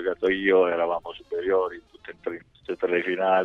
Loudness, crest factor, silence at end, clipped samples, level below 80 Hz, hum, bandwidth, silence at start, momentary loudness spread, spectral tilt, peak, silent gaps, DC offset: -25 LUFS; 16 dB; 0 s; under 0.1%; -60 dBFS; none; 4.9 kHz; 0 s; 15 LU; -7 dB/octave; -8 dBFS; none; under 0.1%